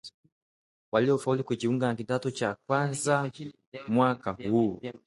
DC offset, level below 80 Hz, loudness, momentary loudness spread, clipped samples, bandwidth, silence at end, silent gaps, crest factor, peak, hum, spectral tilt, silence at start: under 0.1%; -66 dBFS; -28 LUFS; 10 LU; under 0.1%; 11.5 kHz; 0.1 s; 0.14-0.23 s, 0.32-0.92 s, 3.67-3.72 s; 20 dB; -10 dBFS; none; -6 dB/octave; 0.05 s